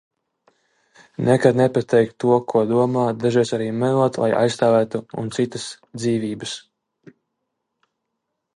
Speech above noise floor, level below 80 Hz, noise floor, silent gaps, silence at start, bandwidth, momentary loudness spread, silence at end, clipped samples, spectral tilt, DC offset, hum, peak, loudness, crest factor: 59 dB; -62 dBFS; -78 dBFS; none; 1.2 s; 11 kHz; 11 LU; 1.95 s; under 0.1%; -6.5 dB/octave; under 0.1%; none; -2 dBFS; -20 LUFS; 20 dB